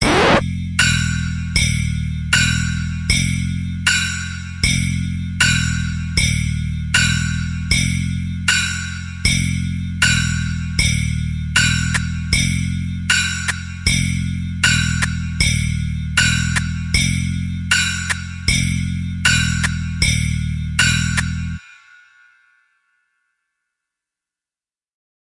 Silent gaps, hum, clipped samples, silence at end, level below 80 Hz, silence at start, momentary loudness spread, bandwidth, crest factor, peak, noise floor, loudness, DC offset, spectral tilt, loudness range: none; none; under 0.1%; 3.65 s; -30 dBFS; 0 s; 8 LU; 11.5 kHz; 18 dB; 0 dBFS; under -90 dBFS; -18 LUFS; under 0.1%; -3.5 dB/octave; 1 LU